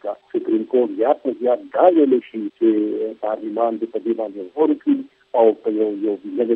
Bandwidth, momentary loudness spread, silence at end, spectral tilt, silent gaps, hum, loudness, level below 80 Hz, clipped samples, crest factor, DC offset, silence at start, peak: 4 kHz; 9 LU; 0 s; -9 dB/octave; none; none; -20 LUFS; -76 dBFS; under 0.1%; 18 dB; under 0.1%; 0.05 s; 0 dBFS